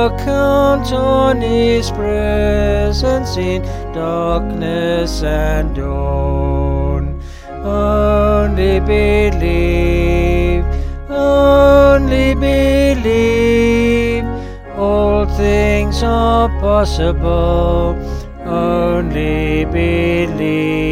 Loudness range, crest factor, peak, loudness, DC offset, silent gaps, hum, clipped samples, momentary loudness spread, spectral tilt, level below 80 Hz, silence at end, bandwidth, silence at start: 6 LU; 12 dB; 0 dBFS; -14 LUFS; under 0.1%; none; none; under 0.1%; 8 LU; -7 dB/octave; -20 dBFS; 0 s; 15 kHz; 0 s